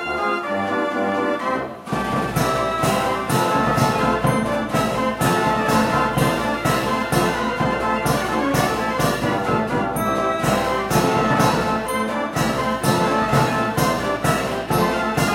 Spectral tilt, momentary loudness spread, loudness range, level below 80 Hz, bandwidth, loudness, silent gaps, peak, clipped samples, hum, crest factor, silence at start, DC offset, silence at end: -5 dB/octave; 4 LU; 1 LU; -40 dBFS; 16 kHz; -20 LUFS; none; -4 dBFS; under 0.1%; none; 16 dB; 0 s; under 0.1%; 0 s